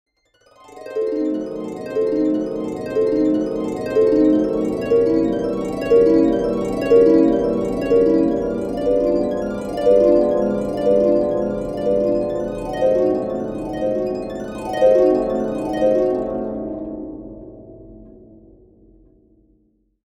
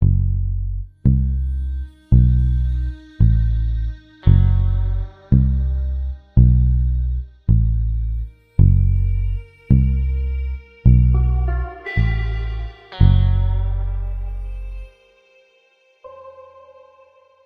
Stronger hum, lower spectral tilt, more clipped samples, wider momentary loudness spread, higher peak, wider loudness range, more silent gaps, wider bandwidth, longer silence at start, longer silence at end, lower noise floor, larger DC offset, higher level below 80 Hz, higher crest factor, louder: neither; second, -7.5 dB/octave vs -10.5 dB/octave; neither; about the same, 12 LU vs 14 LU; about the same, -2 dBFS vs 0 dBFS; first, 7 LU vs 4 LU; neither; first, 10.5 kHz vs 4.4 kHz; first, 0.7 s vs 0 s; first, 1.95 s vs 1.05 s; about the same, -61 dBFS vs -58 dBFS; neither; second, -44 dBFS vs -20 dBFS; about the same, 16 dB vs 18 dB; about the same, -19 LUFS vs -19 LUFS